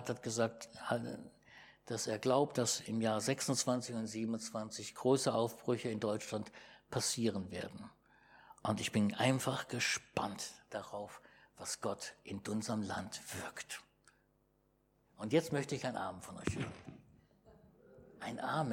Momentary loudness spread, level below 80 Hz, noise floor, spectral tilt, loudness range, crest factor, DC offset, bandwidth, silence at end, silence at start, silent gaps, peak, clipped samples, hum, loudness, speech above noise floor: 15 LU; -70 dBFS; -75 dBFS; -4 dB/octave; 7 LU; 22 dB; under 0.1%; 17 kHz; 0 s; 0 s; none; -16 dBFS; under 0.1%; none; -38 LUFS; 37 dB